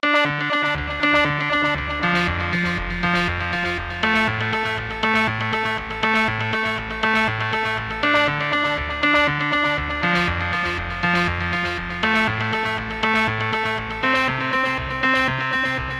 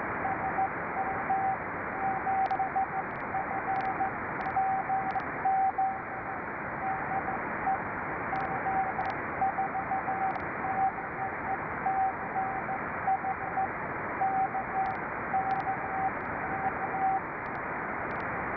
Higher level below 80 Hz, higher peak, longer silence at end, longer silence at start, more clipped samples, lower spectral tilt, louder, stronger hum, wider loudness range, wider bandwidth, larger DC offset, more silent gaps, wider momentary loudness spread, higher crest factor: first, -38 dBFS vs -58 dBFS; first, -4 dBFS vs -18 dBFS; about the same, 0 s vs 0 s; about the same, 0.05 s vs 0 s; neither; second, -5 dB/octave vs -9 dB/octave; first, -20 LUFS vs -31 LUFS; neither; about the same, 1 LU vs 1 LU; first, 14 kHz vs 5.4 kHz; neither; neither; about the same, 5 LU vs 5 LU; first, 18 dB vs 12 dB